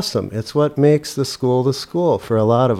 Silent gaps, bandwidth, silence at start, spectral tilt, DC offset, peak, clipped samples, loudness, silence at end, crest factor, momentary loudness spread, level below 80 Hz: none; 15.5 kHz; 0 s; -6.5 dB/octave; under 0.1%; -4 dBFS; under 0.1%; -18 LUFS; 0 s; 14 dB; 7 LU; -52 dBFS